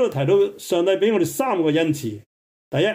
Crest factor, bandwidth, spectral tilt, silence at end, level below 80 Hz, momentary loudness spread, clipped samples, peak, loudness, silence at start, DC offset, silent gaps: 14 dB; 16 kHz; -5.5 dB/octave; 0 s; -64 dBFS; 9 LU; under 0.1%; -8 dBFS; -20 LUFS; 0 s; under 0.1%; 2.26-2.71 s